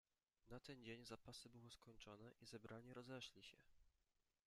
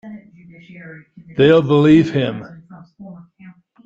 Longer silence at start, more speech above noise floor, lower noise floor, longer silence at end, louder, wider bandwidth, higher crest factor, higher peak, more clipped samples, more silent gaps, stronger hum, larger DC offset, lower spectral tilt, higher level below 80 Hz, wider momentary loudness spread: first, 0.45 s vs 0.05 s; about the same, 29 dB vs 29 dB; first, -89 dBFS vs -44 dBFS; first, 0.55 s vs 0.35 s; second, -60 LUFS vs -14 LUFS; first, 13.5 kHz vs 7.6 kHz; about the same, 20 dB vs 16 dB; second, -42 dBFS vs -2 dBFS; neither; neither; neither; neither; second, -4.5 dB/octave vs -8 dB/octave; second, -80 dBFS vs -54 dBFS; second, 7 LU vs 26 LU